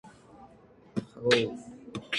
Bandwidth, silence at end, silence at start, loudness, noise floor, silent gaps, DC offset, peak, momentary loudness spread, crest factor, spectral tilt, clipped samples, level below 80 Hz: 11.5 kHz; 0 s; 0.05 s; -29 LUFS; -56 dBFS; none; under 0.1%; -10 dBFS; 17 LU; 24 dB; -4.5 dB/octave; under 0.1%; -66 dBFS